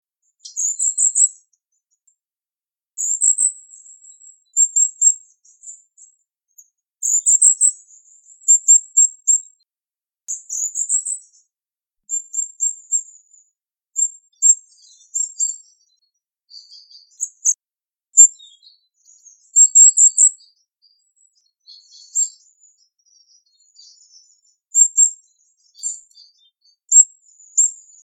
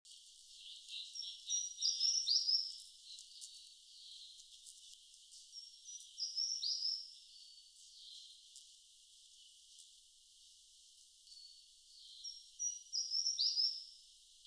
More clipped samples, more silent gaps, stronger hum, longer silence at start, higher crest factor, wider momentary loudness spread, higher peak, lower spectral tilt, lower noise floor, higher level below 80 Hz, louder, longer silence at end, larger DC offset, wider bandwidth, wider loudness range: neither; neither; neither; first, 0.45 s vs 0.05 s; about the same, 20 dB vs 24 dB; second, 17 LU vs 26 LU; first, 0 dBFS vs -20 dBFS; second, 10 dB/octave vs 7.5 dB/octave; first, under -90 dBFS vs -65 dBFS; about the same, under -90 dBFS vs -86 dBFS; first, -14 LUFS vs -37 LUFS; first, 0.3 s vs 0 s; neither; first, 17 kHz vs 11 kHz; second, 11 LU vs 21 LU